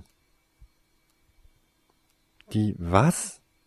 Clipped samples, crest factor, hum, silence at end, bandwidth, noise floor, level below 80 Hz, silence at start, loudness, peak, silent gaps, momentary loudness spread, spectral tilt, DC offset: under 0.1%; 26 dB; none; 0.3 s; 13.5 kHz; -68 dBFS; -48 dBFS; 2.5 s; -25 LUFS; -4 dBFS; none; 10 LU; -6 dB/octave; under 0.1%